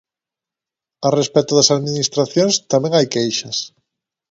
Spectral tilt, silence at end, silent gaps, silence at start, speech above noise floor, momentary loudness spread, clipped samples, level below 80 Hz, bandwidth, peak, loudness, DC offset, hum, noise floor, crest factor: -4 dB/octave; 0.65 s; none; 1 s; 71 dB; 9 LU; under 0.1%; -62 dBFS; 8 kHz; 0 dBFS; -16 LUFS; under 0.1%; none; -87 dBFS; 18 dB